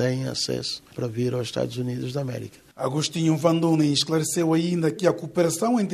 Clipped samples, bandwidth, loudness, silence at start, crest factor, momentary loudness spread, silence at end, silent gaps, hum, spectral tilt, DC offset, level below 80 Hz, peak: under 0.1%; 13.5 kHz; -24 LUFS; 0 s; 18 dB; 10 LU; 0 s; none; none; -5 dB/octave; under 0.1%; -62 dBFS; -6 dBFS